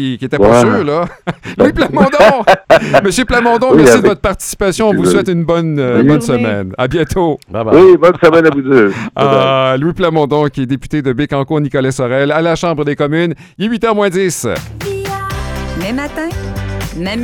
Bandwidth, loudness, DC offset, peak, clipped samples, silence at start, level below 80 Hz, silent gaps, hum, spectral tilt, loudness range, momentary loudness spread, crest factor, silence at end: 18 kHz; -11 LUFS; under 0.1%; 0 dBFS; 0.6%; 0 s; -32 dBFS; none; none; -5.5 dB/octave; 7 LU; 13 LU; 10 dB; 0 s